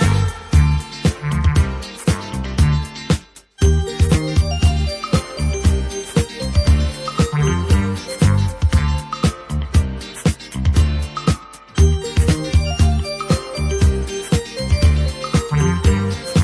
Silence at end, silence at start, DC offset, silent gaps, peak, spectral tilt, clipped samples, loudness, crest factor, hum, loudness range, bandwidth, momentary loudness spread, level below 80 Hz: 0 s; 0 s; under 0.1%; none; -2 dBFS; -6 dB/octave; under 0.1%; -18 LUFS; 14 dB; none; 1 LU; 11 kHz; 6 LU; -22 dBFS